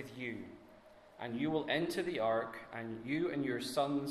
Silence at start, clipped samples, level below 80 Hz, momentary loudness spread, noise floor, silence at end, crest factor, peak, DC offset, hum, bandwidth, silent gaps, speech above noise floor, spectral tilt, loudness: 0 s; under 0.1%; -70 dBFS; 12 LU; -60 dBFS; 0 s; 18 dB; -20 dBFS; under 0.1%; none; 13.5 kHz; none; 23 dB; -5.5 dB/octave; -37 LUFS